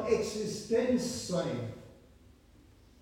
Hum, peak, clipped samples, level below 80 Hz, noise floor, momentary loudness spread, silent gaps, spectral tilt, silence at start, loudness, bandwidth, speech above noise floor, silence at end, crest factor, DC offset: none; -16 dBFS; under 0.1%; -60 dBFS; -59 dBFS; 11 LU; none; -5 dB/octave; 0 s; -33 LUFS; 16.5 kHz; 28 dB; 1.05 s; 18 dB; under 0.1%